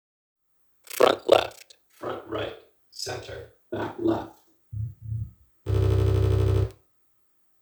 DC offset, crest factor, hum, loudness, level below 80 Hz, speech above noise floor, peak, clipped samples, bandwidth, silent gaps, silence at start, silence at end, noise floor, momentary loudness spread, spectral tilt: under 0.1%; 26 dB; none; -26 LUFS; -38 dBFS; 40 dB; -2 dBFS; under 0.1%; over 20 kHz; none; 0.95 s; 0.9 s; -66 dBFS; 19 LU; -6 dB/octave